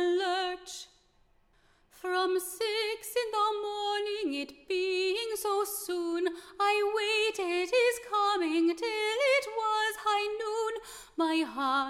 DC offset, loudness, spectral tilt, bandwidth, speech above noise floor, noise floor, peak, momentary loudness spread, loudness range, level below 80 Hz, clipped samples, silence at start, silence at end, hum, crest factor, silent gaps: under 0.1%; -30 LUFS; -1 dB/octave; 16.5 kHz; 36 dB; -66 dBFS; -16 dBFS; 8 LU; 5 LU; -68 dBFS; under 0.1%; 0 s; 0 s; none; 14 dB; none